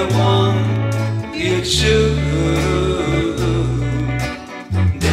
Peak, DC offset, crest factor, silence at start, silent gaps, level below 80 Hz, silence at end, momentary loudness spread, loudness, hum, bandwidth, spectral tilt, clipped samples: -4 dBFS; under 0.1%; 14 dB; 0 s; none; -28 dBFS; 0 s; 7 LU; -17 LUFS; none; 14.5 kHz; -5.5 dB/octave; under 0.1%